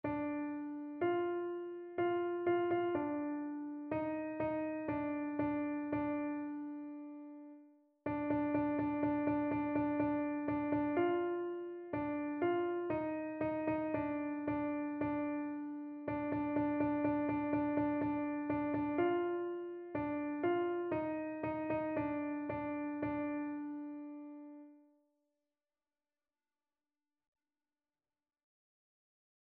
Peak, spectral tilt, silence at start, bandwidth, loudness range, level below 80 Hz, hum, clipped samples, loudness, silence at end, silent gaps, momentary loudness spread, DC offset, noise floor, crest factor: -24 dBFS; -6.5 dB/octave; 0.05 s; 3.8 kHz; 5 LU; -68 dBFS; none; under 0.1%; -38 LUFS; 4.65 s; none; 10 LU; under 0.1%; under -90 dBFS; 16 dB